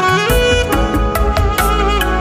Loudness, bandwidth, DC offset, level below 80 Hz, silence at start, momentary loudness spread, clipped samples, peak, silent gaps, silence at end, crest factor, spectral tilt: -14 LUFS; 16 kHz; under 0.1%; -18 dBFS; 0 s; 3 LU; under 0.1%; 0 dBFS; none; 0 s; 12 dB; -4.5 dB/octave